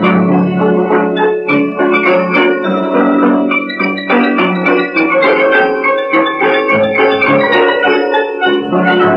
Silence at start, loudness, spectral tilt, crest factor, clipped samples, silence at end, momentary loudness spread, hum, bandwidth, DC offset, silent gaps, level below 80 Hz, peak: 0 s; -11 LUFS; -8 dB/octave; 10 dB; under 0.1%; 0 s; 4 LU; none; 6 kHz; under 0.1%; none; -58 dBFS; -2 dBFS